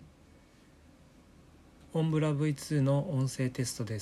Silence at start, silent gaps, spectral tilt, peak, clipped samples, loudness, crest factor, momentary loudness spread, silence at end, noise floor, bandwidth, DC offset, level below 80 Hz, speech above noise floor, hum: 0 s; none; -6.5 dB/octave; -18 dBFS; under 0.1%; -31 LUFS; 16 dB; 6 LU; 0 s; -59 dBFS; 13 kHz; under 0.1%; -64 dBFS; 29 dB; none